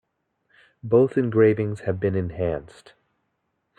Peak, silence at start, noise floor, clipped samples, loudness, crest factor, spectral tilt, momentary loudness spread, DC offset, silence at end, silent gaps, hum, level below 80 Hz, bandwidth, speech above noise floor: -6 dBFS; 0.85 s; -75 dBFS; under 0.1%; -22 LUFS; 18 dB; -9.5 dB/octave; 9 LU; under 0.1%; 1.1 s; none; none; -56 dBFS; 9.2 kHz; 53 dB